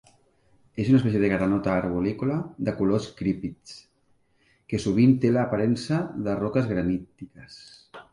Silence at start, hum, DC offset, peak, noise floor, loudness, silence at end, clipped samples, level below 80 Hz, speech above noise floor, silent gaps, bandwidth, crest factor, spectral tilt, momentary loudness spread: 0.75 s; none; under 0.1%; -8 dBFS; -65 dBFS; -25 LUFS; 0.1 s; under 0.1%; -52 dBFS; 41 dB; none; 11 kHz; 18 dB; -7.5 dB/octave; 24 LU